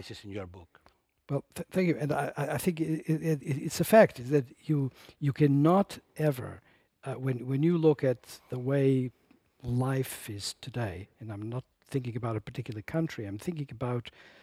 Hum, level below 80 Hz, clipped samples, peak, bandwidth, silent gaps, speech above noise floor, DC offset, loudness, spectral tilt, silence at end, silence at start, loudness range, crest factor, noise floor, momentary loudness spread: none; -62 dBFS; under 0.1%; -6 dBFS; 16 kHz; none; 37 dB; under 0.1%; -30 LUFS; -7 dB/octave; 0.35 s; 0 s; 9 LU; 24 dB; -67 dBFS; 16 LU